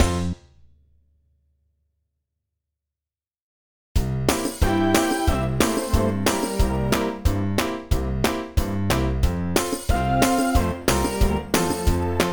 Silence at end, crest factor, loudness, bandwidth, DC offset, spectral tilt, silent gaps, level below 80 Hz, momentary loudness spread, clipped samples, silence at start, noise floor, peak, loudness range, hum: 0 s; 20 dB; -23 LUFS; over 20 kHz; under 0.1%; -5 dB/octave; 3.42-3.95 s; -28 dBFS; 6 LU; under 0.1%; 0 s; under -90 dBFS; -4 dBFS; 8 LU; none